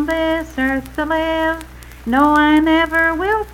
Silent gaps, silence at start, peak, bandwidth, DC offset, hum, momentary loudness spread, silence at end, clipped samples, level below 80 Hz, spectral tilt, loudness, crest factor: none; 0 s; -2 dBFS; 16.5 kHz; under 0.1%; none; 9 LU; 0 s; under 0.1%; -36 dBFS; -5 dB/octave; -16 LUFS; 14 dB